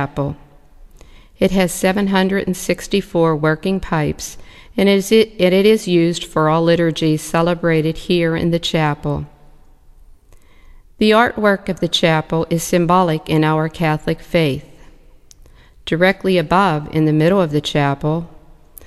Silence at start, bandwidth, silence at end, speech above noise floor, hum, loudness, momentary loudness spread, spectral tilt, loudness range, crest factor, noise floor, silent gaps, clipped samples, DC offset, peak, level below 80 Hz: 0 s; 14 kHz; 0 s; 29 dB; none; -16 LUFS; 9 LU; -5.5 dB/octave; 4 LU; 16 dB; -45 dBFS; none; under 0.1%; under 0.1%; 0 dBFS; -40 dBFS